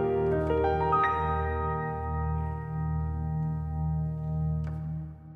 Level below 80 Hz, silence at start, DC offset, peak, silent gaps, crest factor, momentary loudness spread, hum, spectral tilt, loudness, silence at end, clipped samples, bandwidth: -40 dBFS; 0 s; under 0.1%; -14 dBFS; none; 16 dB; 8 LU; none; -10 dB/octave; -30 LUFS; 0 s; under 0.1%; 4.2 kHz